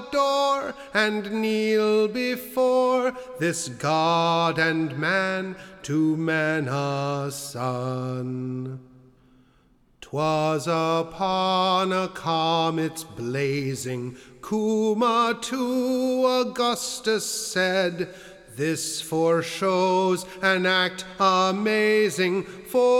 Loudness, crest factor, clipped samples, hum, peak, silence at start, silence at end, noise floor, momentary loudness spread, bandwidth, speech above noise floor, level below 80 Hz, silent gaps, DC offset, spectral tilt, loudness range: -24 LUFS; 16 dB; under 0.1%; none; -8 dBFS; 0 s; 0 s; -60 dBFS; 9 LU; 17.5 kHz; 36 dB; -62 dBFS; none; under 0.1%; -4.5 dB/octave; 6 LU